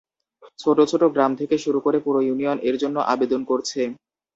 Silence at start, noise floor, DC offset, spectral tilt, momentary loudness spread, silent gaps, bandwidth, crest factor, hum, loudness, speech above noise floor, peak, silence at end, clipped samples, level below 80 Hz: 0.6 s; -53 dBFS; under 0.1%; -5 dB/octave; 7 LU; none; 8 kHz; 16 dB; none; -21 LUFS; 32 dB; -4 dBFS; 0.4 s; under 0.1%; -66 dBFS